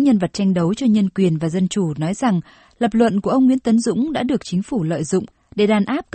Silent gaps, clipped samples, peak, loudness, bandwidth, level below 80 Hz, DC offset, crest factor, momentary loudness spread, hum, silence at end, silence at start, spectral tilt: none; under 0.1%; -2 dBFS; -19 LUFS; 8.8 kHz; -52 dBFS; under 0.1%; 16 dB; 6 LU; none; 0.15 s; 0 s; -6.5 dB/octave